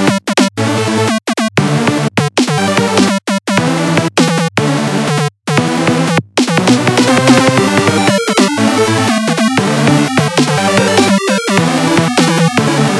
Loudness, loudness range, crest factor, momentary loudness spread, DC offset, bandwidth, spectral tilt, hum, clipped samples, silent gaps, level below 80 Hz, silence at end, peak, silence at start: -11 LUFS; 2 LU; 12 dB; 4 LU; under 0.1%; 12 kHz; -4.5 dB/octave; none; under 0.1%; none; -56 dBFS; 0 s; 0 dBFS; 0 s